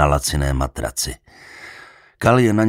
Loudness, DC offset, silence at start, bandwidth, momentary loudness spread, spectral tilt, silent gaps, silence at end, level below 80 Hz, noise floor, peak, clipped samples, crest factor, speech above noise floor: -19 LUFS; under 0.1%; 0 s; 16 kHz; 23 LU; -5 dB/octave; none; 0 s; -30 dBFS; -44 dBFS; -2 dBFS; under 0.1%; 18 dB; 26 dB